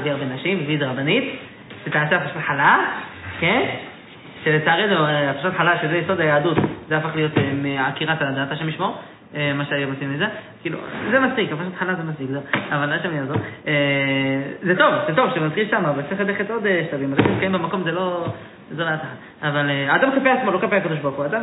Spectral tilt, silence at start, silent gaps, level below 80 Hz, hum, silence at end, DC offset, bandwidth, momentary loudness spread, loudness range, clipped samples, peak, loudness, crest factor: -9.5 dB/octave; 0 s; none; -60 dBFS; none; 0 s; under 0.1%; 4.1 kHz; 11 LU; 4 LU; under 0.1%; -2 dBFS; -20 LUFS; 18 dB